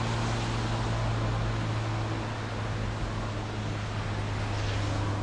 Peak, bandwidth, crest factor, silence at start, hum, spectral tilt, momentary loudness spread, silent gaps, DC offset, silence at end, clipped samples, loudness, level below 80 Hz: -18 dBFS; 10.5 kHz; 12 dB; 0 s; none; -6 dB/octave; 4 LU; none; under 0.1%; 0 s; under 0.1%; -31 LUFS; -40 dBFS